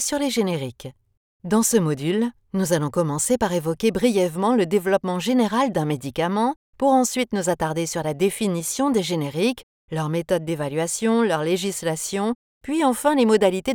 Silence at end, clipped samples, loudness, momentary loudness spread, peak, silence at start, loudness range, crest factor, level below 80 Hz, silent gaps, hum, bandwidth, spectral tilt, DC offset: 0 s; under 0.1%; -22 LUFS; 7 LU; -6 dBFS; 0 s; 3 LU; 16 dB; -54 dBFS; 1.17-1.40 s, 6.56-6.73 s, 9.63-9.88 s, 12.35-12.61 s; none; 19.5 kHz; -4.5 dB/octave; under 0.1%